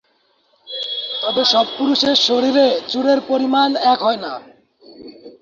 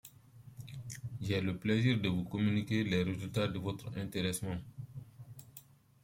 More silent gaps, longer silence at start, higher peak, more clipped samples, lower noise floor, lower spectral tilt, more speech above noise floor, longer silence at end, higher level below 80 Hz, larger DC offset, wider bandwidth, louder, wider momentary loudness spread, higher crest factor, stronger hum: neither; first, 0.65 s vs 0.05 s; first, -2 dBFS vs -16 dBFS; neither; about the same, -61 dBFS vs -59 dBFS; second, -3 dB/octave vs -6 dB/octave; first, 45 dB vs 25 dB; second, 0.1 s vs 0.45 s; about the same, -64 dBFS vs -62 dBFS; neither; second, 7.4 kHz vs 16.5 kHz; first, -16 LUFS vs -35 LUFS; second, 11 LU vs 21 LU; about the same, 16 dB vs 20 dB; neither